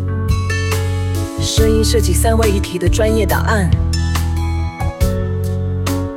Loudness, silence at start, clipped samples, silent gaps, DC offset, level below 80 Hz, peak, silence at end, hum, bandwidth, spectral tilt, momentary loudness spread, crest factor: -16 LUFS; 0 s; under 0.1%; none; 0.2%; -20 dBFS; -2 dBFS; 0 s; none; 16.5 kHz; -5.5 dB/octave; 6 LU; 14 dB